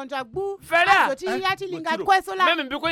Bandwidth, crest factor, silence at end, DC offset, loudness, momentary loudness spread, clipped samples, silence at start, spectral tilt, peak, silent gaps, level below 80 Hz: 16.5 kHz; 18 dB; 0 s; under 0.1%; -21 LUFS; 12 LU; under 0.1%; 0 s; -3 dB/octave; -4 dBFS; none; -58 dBFS